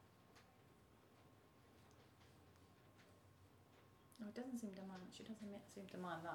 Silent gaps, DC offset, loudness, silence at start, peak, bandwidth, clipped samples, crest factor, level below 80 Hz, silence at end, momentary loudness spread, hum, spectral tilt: none; under 0.1%; -54 LUFS; 0 s; -34 dBFS; 19 kHz; under 0.1%; 22 dB; -84 dBFS; 0 s; 19 LU; none; -5.5 dB/octave